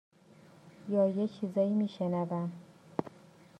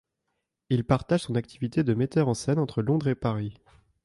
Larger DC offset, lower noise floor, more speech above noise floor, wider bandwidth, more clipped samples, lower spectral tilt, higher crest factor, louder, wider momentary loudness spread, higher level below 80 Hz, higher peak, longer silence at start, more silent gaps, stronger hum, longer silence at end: neither; second, -59 dBFS vs -80 dBFS; second, 27 dB vs 55 dB; second, 9 kHz vs 11.5 kHz; neither; first, -9 dB/octave vs -7 dB/octave; about the same, 20 dB vs 18 dB; second, -33 LUFS vs -27 LUFS; first, 15 LU vs 5 LU; second, -80 dBFS vs -54 dBFS; second, -14 dBFS vs -8 dBFS; about the same, 0.65 s vs 0.7 s; neither; neither; about the same, 0.5 s vs 0.5 s